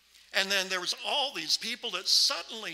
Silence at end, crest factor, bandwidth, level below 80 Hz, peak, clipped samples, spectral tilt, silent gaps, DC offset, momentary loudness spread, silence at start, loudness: 0 s; 22 dB; 16 kHz; -78 dBFS; -8 dBFS; under 0.1%; 0.5 dB/octave; none; under 0.1%; 9 LU; 0.35 s; -27 LUFS